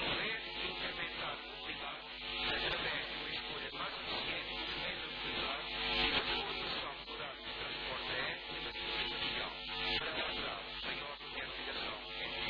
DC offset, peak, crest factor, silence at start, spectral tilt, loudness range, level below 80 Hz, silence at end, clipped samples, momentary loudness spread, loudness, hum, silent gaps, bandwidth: under 0.1%; -22 dBFS; 18 dB; 0 s; -4.5 dB/octave; 2 LU; -58 dBFS; 0 s; under 0.1%; 7 LU; -38 LUFS; none; none; 5.2 kHz